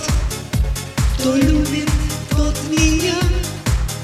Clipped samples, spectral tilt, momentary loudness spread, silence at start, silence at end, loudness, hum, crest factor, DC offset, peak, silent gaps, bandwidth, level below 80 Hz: under 0.1%; -5 dB/octave; 6 LU; 0 s; 0 s; -18 LUFS; none; 18 dB; under 0.1%; 0 dBFS; none; 15 kHz; -20 dBFS